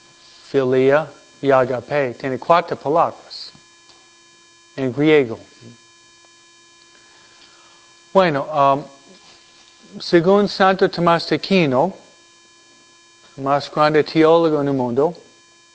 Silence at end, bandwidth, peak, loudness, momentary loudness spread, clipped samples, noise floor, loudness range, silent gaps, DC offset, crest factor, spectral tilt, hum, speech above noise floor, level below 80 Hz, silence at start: 0.6 s; 8 kHz; 0 dBFS; -17 LUFS; 12 LU; under 0.1%; -50 dBFS; 5 LU; none; under 0.1%; 20 dB; -6.5 dB/octave; none; 33 dB; -60 dBFS; 0.55 s